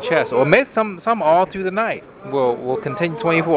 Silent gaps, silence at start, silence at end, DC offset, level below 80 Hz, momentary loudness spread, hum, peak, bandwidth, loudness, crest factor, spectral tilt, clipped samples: none; 0 s; 0 s; under 0.1%; -56 dBFS; 9 LU; none; -2 dBFS; 4 kHz; -18 LUFS; 16 dB; -10 dB/octave; under 0.1%